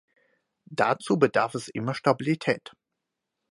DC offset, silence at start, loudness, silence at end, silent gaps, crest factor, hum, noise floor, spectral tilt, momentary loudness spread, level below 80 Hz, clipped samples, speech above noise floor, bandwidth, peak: under 0.1%; 0.7 s; -26 LUFS; 0.9 s; none; 22 dB; none; -84 dBFS; -6 dB/octave; 9 LU; -70 dBFS; under 0.1%; 59 dB; 11.5 kHz; -6 dBFS